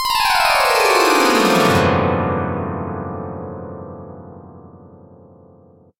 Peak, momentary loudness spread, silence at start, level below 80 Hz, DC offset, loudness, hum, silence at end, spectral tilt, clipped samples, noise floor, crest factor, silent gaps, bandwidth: -2 dBFS; 20 LU; 0 s; -48 dBFS; under 0.1%; -16 LUFS; none; 1.1 s; -4 dB/octave; under 0.1%; -48 dBFS; 18 dB; none; 16.5 kHz